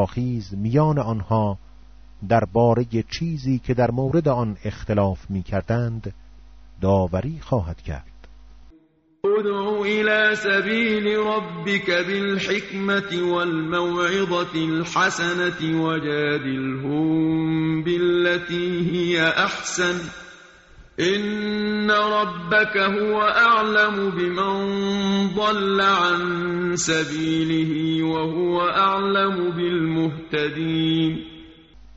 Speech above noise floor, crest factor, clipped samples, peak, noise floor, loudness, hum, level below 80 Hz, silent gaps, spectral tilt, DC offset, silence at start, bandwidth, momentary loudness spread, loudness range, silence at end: 36 dB; 16 dB; under 0.1%; -6 dBFS; -57 dBFS; -21 LUFS; none; -46 dBFS; none; -4 dB/octave; under 0.1%; 0 s; 8 kHz; 7 LU; 5 LU; 0.45 s